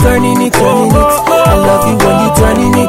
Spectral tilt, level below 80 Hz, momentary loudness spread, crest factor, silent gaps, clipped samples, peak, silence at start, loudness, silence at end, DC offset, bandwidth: -5.5 dB/octave; -20 dBFS; 1 LU; 8 dB; none; 0.4%; 0 dBFS; 0 s; -8 LUFS; 0 s; under 0.1%; 16.5 kHz